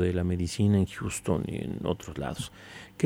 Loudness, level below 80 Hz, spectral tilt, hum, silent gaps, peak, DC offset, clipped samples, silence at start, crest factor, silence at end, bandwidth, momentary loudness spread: -30 LUFS; -48 dBFS; -6 dB/octave; none; none; -12 dBFS; under 0.1%; under 0.1%; 0 s; 16 dB; 0 s; 16 kHz; 14 LU